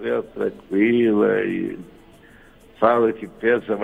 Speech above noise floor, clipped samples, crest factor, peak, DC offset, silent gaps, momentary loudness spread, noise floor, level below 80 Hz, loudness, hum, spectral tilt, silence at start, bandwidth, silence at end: 28 dB; under 0.1%; 20 dB; 0 dBFS; under 0.1%; none; 10 LU; -48 dBFS; -56 dBFS; -21 LUFS; none; -8 dB/octave; 0 s; 4.3 kHz; 0 s